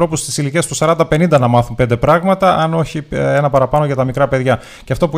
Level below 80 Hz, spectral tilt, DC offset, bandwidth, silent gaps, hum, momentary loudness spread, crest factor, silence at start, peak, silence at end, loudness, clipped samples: -36 dBFS; -6 dB/octave; under 0.1%; 16 kHz; none; none; 6 LU; 14 dB; 0 s; 0 dBFS; 0 s; -14 LUFS; under 0.1%